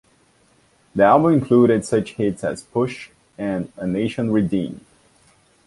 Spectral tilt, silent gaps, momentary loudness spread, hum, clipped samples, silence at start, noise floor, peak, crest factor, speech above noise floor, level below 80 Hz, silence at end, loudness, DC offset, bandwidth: -7 dB/octave; none; 15 LU; none; under 0.1%; 0.95 s; -58 dBFS; -2 dBFS; 18 dB; 39 dB; -52 dBFS; 0.9 s; -20 LUFS; under 0.1%; 11.5 kHz